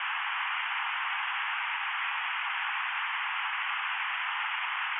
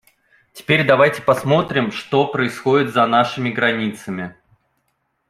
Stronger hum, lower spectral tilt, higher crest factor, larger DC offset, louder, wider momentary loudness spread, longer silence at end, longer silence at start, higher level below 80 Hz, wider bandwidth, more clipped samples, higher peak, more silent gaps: neither; second, 4 dB/octave vs -6 dB/octave; second, 12 dB vs 18 dB; neither; second, -31 LUFS vs -17 LUFS; second, 0 LU vs 14 LU; second, 0 s vs 1 s; second, 0 s vs 0.55 s; second, under -90 dBFS vs -58 dBFS; second, 4 kHz vs 15.5 kHz; neither; second, -20 dBFS vs -2 dBFS; neither